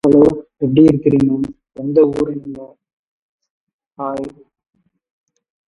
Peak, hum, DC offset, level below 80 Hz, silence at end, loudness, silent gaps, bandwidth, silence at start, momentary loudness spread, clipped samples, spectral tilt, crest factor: 0 dBFS; none; under 0.1%; -48 dBFS; 1.4 s; -15 LUFS; 2.93-3.39 s, 3.50-3.67 s, 3.73-3.79 s, 3.87-3.91 s; 9.2 kHz; 0.05 s; 17 LU; under 0.1%; -9.5 dB/octave; 16 dB